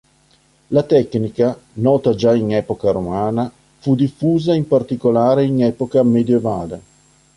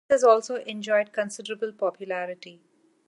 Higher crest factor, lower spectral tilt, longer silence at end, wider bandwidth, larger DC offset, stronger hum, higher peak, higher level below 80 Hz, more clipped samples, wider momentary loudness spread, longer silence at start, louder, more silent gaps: second, 14 dB vs 20 dB; first, -8.5 dB/octave vs -3.5 dB/octave; about the same, 0.55 s vs 0.55 s; about the same, 11 kHz vs 11.5 kHz; neither; neither; first, -2 dBFS vs -6 dBFS; first, -48 dBFS vs -74 dBFS; neither; second, 8 LU vs 13 LU; first, 0.7 s vs 0.1 s; first, -17 LUFS vs -26 LUFS; neither